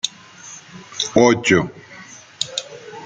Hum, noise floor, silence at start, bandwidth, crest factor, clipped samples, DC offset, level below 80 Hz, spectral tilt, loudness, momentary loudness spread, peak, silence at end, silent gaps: none; -41 dBFS; 0.05 s; 9.6 kHz; 20 dB; under 0.1%; under 0.1%; -54 dBFS; -4 dB/octave; -18 LUFS; 24 LU; -2 dBFS; 0 s; none